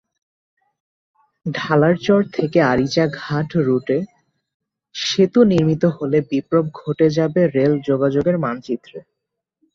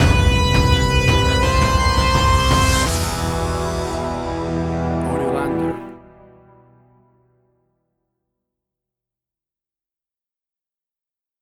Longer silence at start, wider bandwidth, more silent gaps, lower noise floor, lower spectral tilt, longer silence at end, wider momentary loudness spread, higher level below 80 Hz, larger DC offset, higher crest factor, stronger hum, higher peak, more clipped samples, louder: first, 1.45 s vs 0 s; second, 7.6 kHz vs 16 kHz; first, 4.54-4.60 s vs none; second, -80 dBFS vs under -90 dBFS; first, -6.5 dB/octave vs -5 dB/octave; second, 0.75 s vs 5.45 s; first, 11 LU vs 8 LU; second, -54 dBFS vs -26 dBFS; neither; about the same, 16 dB vs 18 dB; neither; about the same, -2 dBFS vs -2 dBFS; neither; about the same, -18 LUFS vs -18 LUFS